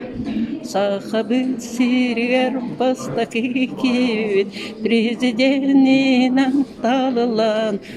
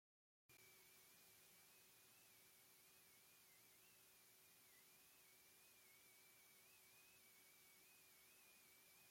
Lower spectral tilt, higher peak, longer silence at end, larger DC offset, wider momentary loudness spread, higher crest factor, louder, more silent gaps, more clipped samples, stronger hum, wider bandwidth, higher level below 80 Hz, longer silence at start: first, -5 dB/octave vs -0.5 dB/octave; first, -6 dBFS vs -58 dBFS; about the same, 0 s vs 0 s; neither; first, 8 LU vs 1 LU; about the same, 12 dB vs 14 dB; first, -18 LUFS vs -68 LUFS; neither; neither; neither; second, 12 kHz vs 16.5 kHz; first, -54 dBFS vs under -90 dBFS; second, 0 s vs 0.5 s